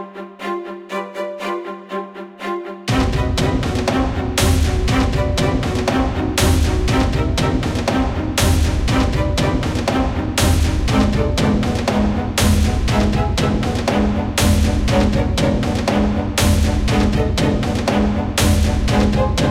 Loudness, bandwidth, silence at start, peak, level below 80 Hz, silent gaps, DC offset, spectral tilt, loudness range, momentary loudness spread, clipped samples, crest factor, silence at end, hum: -18 LUFS; 16.5 kHz; 0 s; -2 dBFS; -22 dBFS; none; under 0.1%; -5.5 dB/octave; 3 LU; 10 LU; under 0.1%; 14 dB; 0 s; none